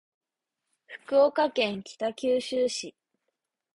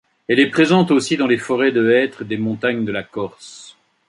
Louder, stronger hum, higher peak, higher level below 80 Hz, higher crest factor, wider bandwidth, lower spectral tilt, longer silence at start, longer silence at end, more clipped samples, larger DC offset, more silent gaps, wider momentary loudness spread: second, -27 LUFS vs -17 LUFS; neither; second, -10 dBFS vs -2 dBFS; second, -74 dBFS vs -60 dBFS; about the same, 18 dB vs 16 dB; about the same, 11.5 kHz vs 11.5 kHz; second, -3.5 dB/octave vs -5.5 dB/octave; first, 0.9 s vs 0.3 s; first, 0.85 s vs 0.4 s; neither; neither; neither; first, 18 LU vs 14 LU